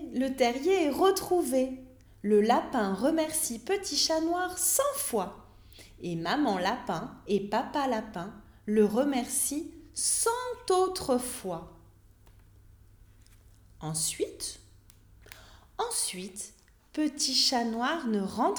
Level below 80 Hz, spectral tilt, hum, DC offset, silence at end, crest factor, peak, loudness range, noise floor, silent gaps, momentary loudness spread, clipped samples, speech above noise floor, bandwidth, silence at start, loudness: -58 dBFS; -3 dB/octave; none; under 0.1%; 0 s; 18 dB; -12 dBFS; 10 LU; -57 dBFS; none; 14 LU; under 0.1%; 28 dB; over 20 kHz; 0 s; -29 LUFS